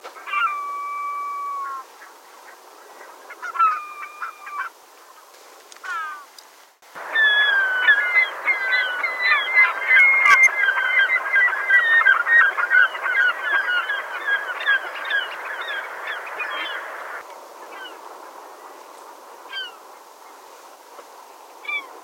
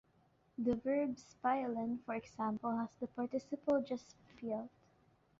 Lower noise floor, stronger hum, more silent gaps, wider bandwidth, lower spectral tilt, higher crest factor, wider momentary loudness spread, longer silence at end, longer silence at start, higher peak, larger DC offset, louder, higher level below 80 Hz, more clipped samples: second, -49 dBFS vs -73 dBFS; neither; neither; first, 16.5 kHz vs 7.6 kHz; second, 1.5 dB/octave vs -6 dB/octave; about the same, 20 dB vs 16 dB; first, 21 LU vs 8 LU; second, 0 s vs 0.7 s; second, 0.05 s vs 0.6 s; first, -2 dBFS vs -24 dBFS; neither; first, -18 LUFS vs -39 LUFS; second, -80 dBFS vs -72 dBFS; neither